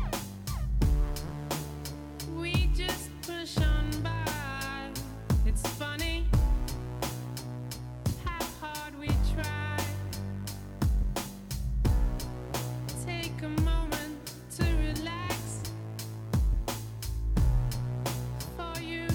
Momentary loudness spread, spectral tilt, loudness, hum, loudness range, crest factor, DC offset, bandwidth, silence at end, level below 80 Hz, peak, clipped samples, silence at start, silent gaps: 10 LU; -5 dB/octave; -33 LUFS; none; 2 LU; 14 dB; under 0.1%; 19 kHz; 0 s; -34 dBFS; -16 dBFS; under 0.1%; 0 s; none